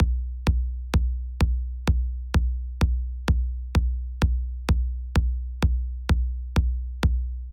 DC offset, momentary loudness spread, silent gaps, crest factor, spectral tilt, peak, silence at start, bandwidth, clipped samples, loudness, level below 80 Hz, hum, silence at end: under 0.1%; 3 LU; none; 14 dB; -6.5 dB/octave; -10 dBFS; 0 s; 10.5 kHz; under 0.1%; -27 LUFS; -24 dBFS; none; 0 s